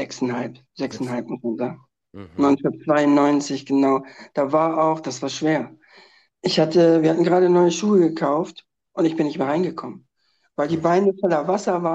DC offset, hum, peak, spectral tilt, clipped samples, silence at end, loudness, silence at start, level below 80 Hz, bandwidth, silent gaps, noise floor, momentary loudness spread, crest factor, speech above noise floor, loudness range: under 0.1%; none; -4 dBFS; -6 dB/octave; under 0.1%; 0 s; -20 LUFS; 0 s; -68 dBFS; 8.4 kHz; none; -68 dBFS; 14 LU; 16 dB; 48 dB; 4 LU